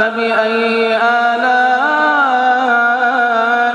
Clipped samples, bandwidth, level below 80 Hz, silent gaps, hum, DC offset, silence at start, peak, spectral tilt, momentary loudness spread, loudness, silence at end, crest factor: under 0.1%; 9.8 kHz; -68 dBFS; none; none; under 0.1%; 0 s; 0 dBFS; -3.5 dB/octave; 2 LU; -12 LUFS; 0 s; 12 dB